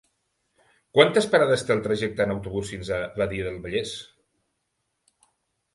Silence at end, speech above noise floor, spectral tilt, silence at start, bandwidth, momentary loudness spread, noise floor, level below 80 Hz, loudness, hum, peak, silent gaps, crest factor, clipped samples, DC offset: 1.7 s; 54 dB; -4.5 dB/octave; 0.95 s; 11.5 kHz; 12 LU; -77 dBFS; -52 dBFS; -24 LUFS; none; -2 dBFS; none; 24 dB; under 0.1%; under 0.1%